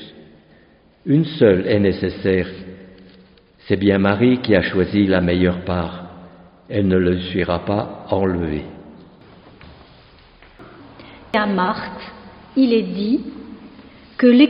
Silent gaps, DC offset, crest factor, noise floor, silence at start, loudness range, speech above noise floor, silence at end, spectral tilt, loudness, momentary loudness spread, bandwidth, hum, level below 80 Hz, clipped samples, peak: none; under 0.1%; 18 dB; -52 dBFS; 0 s; 8 LU; 35 dB; 0 s; -5.5 dB/octave; -18 LUFS; 20 LU; 5.4 kHz; none; -46 dBFS; under 0.1%; 0 dBFS